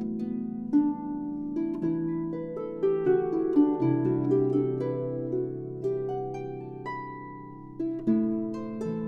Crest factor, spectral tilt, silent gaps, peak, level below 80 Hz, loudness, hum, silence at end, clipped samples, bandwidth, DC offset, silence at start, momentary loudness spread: 16 dB; -10.5 dB/octave; none; -12 dBFS; -60 dBFS; -29 LUFS; none; 0 s; under 0.1%; 6.6 kHz; under 0.1%; 0 s; 12 LU